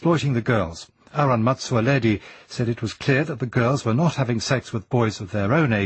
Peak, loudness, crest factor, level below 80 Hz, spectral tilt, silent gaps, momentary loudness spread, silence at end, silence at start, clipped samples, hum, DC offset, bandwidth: -4 dBFS; -22 LUFS; 18 dB; -52 dBFS; -6.5 dB/octave; none; 7 LU; 0 s; 0 s; under 0.1%; none; under 0.1%; 8.6 kHz